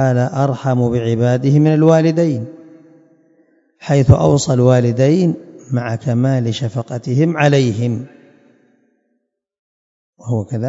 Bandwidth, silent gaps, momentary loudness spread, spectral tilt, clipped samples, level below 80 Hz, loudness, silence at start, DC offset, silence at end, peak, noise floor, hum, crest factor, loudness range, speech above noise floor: 7.8 kHz; 9.59-10.13 s; 12 LU; -7.5 dB/octave; 0.1%; -42 dBFS; -15 LUFS; 0 s; under 0.1%; 0 s; 0 dBFS; -70 dBFS; none; 16 dB; 5 LU; 56 dB